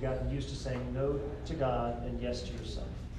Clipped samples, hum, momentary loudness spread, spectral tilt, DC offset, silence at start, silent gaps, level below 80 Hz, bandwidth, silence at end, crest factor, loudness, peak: under 0.1%; none; 8 LU; -6.5 dB/octave; under 0.1%; 0 s; none; -42 dBFS; 10.5 kHz; 0 s; 14 dB; -36 LUFS; -20 dBFS